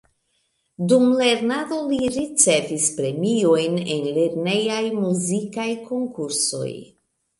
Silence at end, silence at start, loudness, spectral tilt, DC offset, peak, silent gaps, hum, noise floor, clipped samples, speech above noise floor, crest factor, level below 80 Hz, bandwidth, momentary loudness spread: 0.55 s; 0.8 s; -21 LUFS; -4 dB/octave; under 0.1%; -2 dBFS; none; none; -70 dBFS; under 0.1%; 49 dB; 18 dB; -60 dBFS; 11.5 kHz; 10 LU